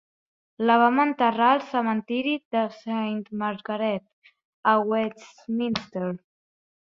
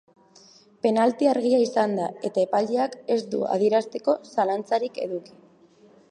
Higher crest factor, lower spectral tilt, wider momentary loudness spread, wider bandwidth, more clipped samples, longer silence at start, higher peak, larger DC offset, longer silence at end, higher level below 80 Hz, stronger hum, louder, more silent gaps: about the same, 20 dB vs 18 dB; about the same, -6.5 dB/octave vs -5.5 dB/octave; first, 12 LU vs 7 LU; second, 7.2 kHz vs 10.5 kHz; neither; second, 0.6 s vs 0.85 s; about the same, -6 dBFS vs -8 dBFS; neither; second, 0.7 s vs 0.85 s; first, -70 dBFS vs -78 dBFS; neither; about the same, -25 LUFS vs -24 LUFS; first, 2.45-2.51 s, 4.13-4.22 s, 4.45-4.63 s vs none